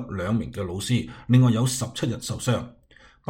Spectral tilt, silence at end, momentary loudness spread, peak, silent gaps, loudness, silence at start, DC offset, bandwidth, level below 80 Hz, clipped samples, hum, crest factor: -6 dB/octave; 0.6 s; 10 LU; -6 dBFS; none; -24 LUFS; 0 s; under 0.1%; 16.5 kHz; -50 dBFS; under 0.1%; none; 18 dB